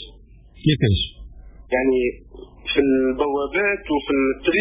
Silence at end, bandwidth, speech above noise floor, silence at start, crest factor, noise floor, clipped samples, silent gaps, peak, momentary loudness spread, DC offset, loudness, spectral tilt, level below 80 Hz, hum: 0 s; 4 kHz; 26 dB; 0 s; 16 dB; -46 dBFS; under 0.1%; none; -6 dBFS; 8 LU; under 0.1%; -21 LUFS; -10.5 dB/octave; -38 dBFS; none